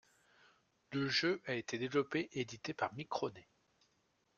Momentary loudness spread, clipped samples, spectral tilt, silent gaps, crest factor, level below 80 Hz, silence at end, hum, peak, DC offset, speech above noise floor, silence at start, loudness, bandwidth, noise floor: 9 LU; under 0.1%; -4.5 dB/octave; none; 20 dB; -78 dBFS; 0.95 s; none; -20 dBFS; under 0.1%; 40 dB; 0.9 s; -39 LUFS; 8 kHz; -78 dBFS